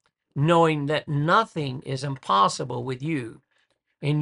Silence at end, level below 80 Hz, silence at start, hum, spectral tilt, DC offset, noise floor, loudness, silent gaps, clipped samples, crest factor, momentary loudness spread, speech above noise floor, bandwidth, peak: 0 s; -64 dBFS; 0.35 s; none; -6 dB/octave; under 0.1%; -70 dBFS; -24 LUFS; none; under 0.1%; 18 dB; 11 LU; 47 dB; 11 kHz; -6 dBFS